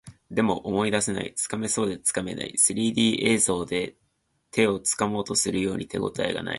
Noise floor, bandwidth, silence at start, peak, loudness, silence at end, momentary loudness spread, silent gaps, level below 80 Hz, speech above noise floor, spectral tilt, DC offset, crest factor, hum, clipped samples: -56 dBFS; 12 kHz; 0.05 s; -6 dBFS; -25 LUFS; 0 s; 8 LU; none; -56 dBFS; 31 dB; -3 dB/octave; under 0.1%; 20 dB; none; under 0.1%